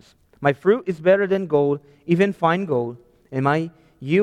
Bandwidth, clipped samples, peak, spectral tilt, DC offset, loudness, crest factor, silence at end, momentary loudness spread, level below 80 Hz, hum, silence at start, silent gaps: 9.4 kHz; under 0.1%; -4 dBFS; -8 dB/octave; under 0.1%; -21 LUFS; 16 dB; 0 s; 11 LU; -60 dBFS; none; 0.4 s; none